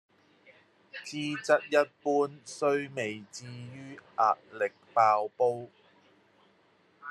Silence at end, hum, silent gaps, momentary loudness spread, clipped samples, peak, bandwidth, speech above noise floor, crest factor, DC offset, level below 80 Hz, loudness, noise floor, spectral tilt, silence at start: 0 s; none; none; 19 LU; under 0.1%; -10 dBFS; 12.5 kHz; 36 dB; 22 dB; under 0.1%; -84 dBFS; -29 LUFS; -66 dBFS; -4.5 dB/octave; 0.95 s